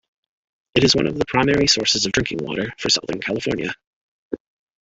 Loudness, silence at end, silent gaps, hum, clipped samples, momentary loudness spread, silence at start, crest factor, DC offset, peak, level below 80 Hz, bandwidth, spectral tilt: -19 LUFS; 0.45 s; 3.87-4.31 s; none; under 0.1%; 18 LU; 0.75 s; 20 dB; under 0.1%; -2 dBFS; -46 dBFS; 8.4 kHz; -3.5 dB/octave